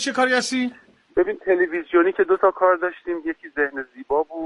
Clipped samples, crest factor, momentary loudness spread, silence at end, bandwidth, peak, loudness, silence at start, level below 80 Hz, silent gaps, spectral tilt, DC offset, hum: under 0.1%; 16 dB; 10 LU; 0 s; 11.5 kHz; -6 dBFS; -21 LUFS; 0 s; -58 dBFS; none; -3 dB/octave; under 0.1%; none